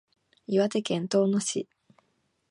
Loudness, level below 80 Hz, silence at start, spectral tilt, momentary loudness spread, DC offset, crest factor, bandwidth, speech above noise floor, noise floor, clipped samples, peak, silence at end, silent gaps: -27 LUFS; -76 dBFS; 0.5 s; -5 dB/octave; 14 LU; under 0.1%; 18 dB; 11.5 kHz; 47 dB; -73 dBFS; under 0.1%; -12 dBFS; 0.85 s; none